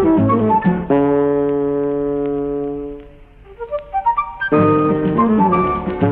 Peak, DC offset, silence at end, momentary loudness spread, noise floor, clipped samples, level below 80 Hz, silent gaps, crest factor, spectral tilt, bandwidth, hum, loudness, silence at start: -2 dBFS; under 0.1%; 0 s; 12 LU; -41 dBFS; under 0.1%; -40 dBFS; none; 14 dB; -11.5 dB/octave; 4 kHz; none; -17 LUFS; 0 s